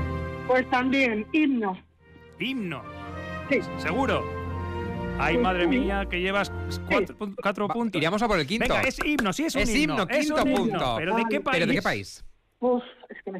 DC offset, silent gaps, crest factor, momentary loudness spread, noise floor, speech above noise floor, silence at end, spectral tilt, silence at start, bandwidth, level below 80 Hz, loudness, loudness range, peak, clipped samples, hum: under 0.1%; none; 14 dB; 10 LU; -52 dBFS; 26 dB; 0 s; -5 dB/octave; 0 s; 15.5 kHz; -42 dBFS; -26 LUFS; 4 LU; -12 dBFS; under 0.1%; none